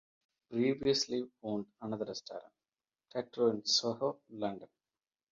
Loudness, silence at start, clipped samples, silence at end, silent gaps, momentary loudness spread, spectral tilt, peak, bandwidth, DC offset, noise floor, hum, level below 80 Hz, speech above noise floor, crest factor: -35 LUFS; 0.5 s; under 0.1%; 0.65 s; none; 13 LU; -3.5 dB/octave; -18 dBFS; 7.4 kHz; under 0.1%; under -90 dBFS; none; -74 dBFS; over 55 dB; 20 dB